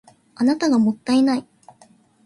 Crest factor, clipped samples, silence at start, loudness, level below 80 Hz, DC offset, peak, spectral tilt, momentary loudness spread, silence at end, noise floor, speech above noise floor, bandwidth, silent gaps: 14 dB; under 0.1%; 0.4 s; -19 LUFS; -66 dBFS; under 0.1%; -8 dBFS; -5.5 dB/octave; 4 LU; 0.85 s; -54 dBFS; 36 dB; 11.5 kHz; none